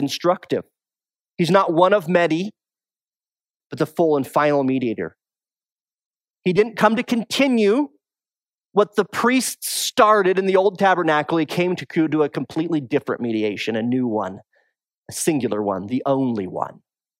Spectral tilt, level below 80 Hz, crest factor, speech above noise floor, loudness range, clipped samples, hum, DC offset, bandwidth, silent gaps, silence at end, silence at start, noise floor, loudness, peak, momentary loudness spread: -5 dB/octave; -70 dBFS; 20 dB; over 71 dB; 5 LU; under 0.1%; none; under 0.1%; 16 kHz; 5.72-5.76 s, 6.06-6.11 s, 6.30-6.34 s, 8.54-8.58 s, 14.98-15.03 s; 0.45 s; 0 s; under -90 dBFS; -20 LUFS; 0 dBFS; 10 LU